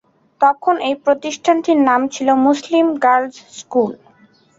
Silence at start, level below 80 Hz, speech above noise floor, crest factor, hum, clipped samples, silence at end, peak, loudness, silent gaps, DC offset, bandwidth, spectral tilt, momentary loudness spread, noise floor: 0.4 s; -64 dBFS; 36 dB; 14 dB; none; under 0.1%; 0.65 s; -2 dBFS; -16 LUFS; none; under 0.1%; 7.8 kHz; -4 dB/octave; 6 LU; -51 dBFS